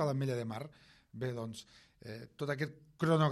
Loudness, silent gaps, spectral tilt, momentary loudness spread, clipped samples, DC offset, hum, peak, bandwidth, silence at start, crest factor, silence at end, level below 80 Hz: -38 LUFS; none; -7 dB/octave; 18 LU; under 0.1%; under 0.1%; none; -18 dBFS; 13 kHz; 0 s; 20 dB; 0 s; -72 dBFS